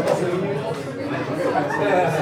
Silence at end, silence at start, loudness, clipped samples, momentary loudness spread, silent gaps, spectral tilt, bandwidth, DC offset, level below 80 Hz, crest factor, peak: 0 s; 0 s; -23 LUFS; under 0.1%; 8 LU; none; -6 dB/octave; over 20 kHz; under 0.1%; -68 dBFS; 14 dB; -8 dBFS